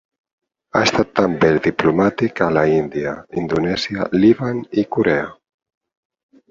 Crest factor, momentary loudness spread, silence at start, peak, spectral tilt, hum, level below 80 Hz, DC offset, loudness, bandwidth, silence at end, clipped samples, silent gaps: 18 dB; 7 LU; 0.75 s; -2 dBFS; -6 dB/octave; none; -48 dBFS; under 0.1%; -18 LUFS; 7.6 kHz; 1.15 s; under 0.1%; none